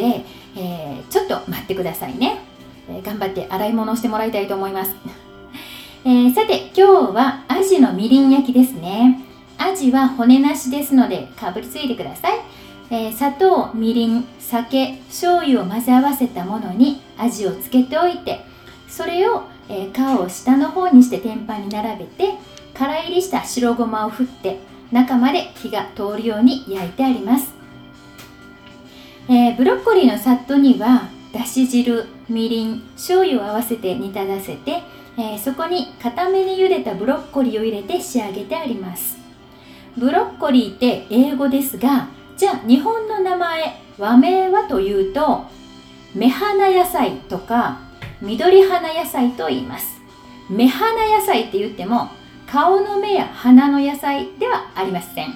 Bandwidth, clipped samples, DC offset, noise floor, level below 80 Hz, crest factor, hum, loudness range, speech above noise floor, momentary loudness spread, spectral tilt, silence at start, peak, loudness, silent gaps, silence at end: 17 kHz; under 0.1%; under 0.1%; -43 dBFS; -52 dBFS; 18 dB; none; 7 LU; 26 dB; 14 LU; -5 dB/octave; 0 s; 0 dBFS; -18 LUFS; none; 0 s